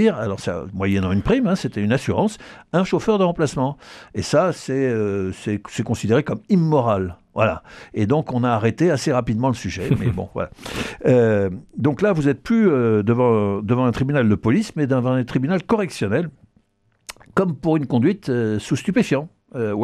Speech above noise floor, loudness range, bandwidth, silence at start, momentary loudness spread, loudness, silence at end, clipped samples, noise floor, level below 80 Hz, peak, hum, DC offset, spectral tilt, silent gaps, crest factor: 44 dB; 4 LU; 13 kHz; 0 s; 9 LU; -20 LUFS; 0 s; under 0.1%; -64 dBFS; -46 dBFS; -4 dBFS; none; under 0.1%; -7 dB/octave; none; 16 dB